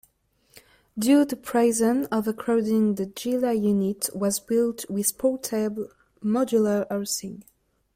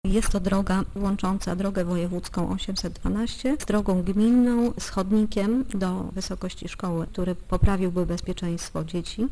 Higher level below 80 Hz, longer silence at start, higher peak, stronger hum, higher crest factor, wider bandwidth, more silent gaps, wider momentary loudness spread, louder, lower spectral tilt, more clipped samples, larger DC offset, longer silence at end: second, -64 dBFS vs -34 dBFS; first, 0.55 s vs 0.05 s; about the same, -8 dBFS vs -6 dBFS; neither; about the same, 16 dB vs 18 dB; first, 16.5 kHz vs 11 kHz; neither; about the same, 9 LU vs 8 LU; about the same, -24 LUFS vs -26 LUFS; about the same, -5 dB/octave vs -6 dB/octave; neither; neither; first, 0.55 s vs 0 s